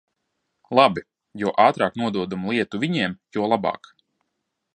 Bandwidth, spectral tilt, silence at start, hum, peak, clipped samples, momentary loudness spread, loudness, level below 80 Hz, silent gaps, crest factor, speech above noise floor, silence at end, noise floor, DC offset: 9.4 kHz; -6 dB/octave; 0.7 s; none; -2 dBFS; under 0.1%; 10 LU; -22 LUFS; -62 dBFS; none; 22 dB; 57 dB; 1 s; -78 dBFS; under 0.1%